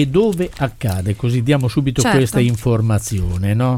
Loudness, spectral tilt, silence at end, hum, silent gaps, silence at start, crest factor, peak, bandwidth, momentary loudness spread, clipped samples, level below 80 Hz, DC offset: -17 LUFS; -6 dB/octave; 0 s; none; none; 0 s; 14 dB; -2 dBFS; 16.5 kHz; 6 LU; under 0.1%; -34 dBFS; under 0.1%